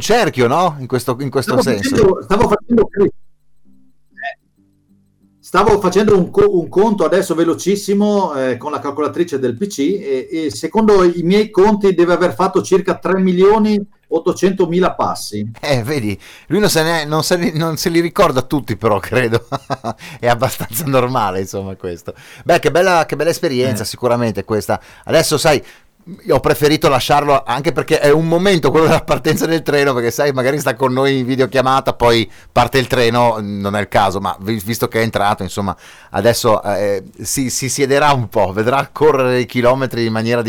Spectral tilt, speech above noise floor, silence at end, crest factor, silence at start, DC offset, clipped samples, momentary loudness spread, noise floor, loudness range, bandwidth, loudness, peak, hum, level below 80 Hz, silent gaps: -5 dB/octave; 42 dB; 0 s; 12 dB; 0 s; under 0.1%; under 0.1%; 8 LU; -57 dBFS; 4 LU; over 20 kHz; -15 LUFS; -4 dBFS; none; -40 dBFS; none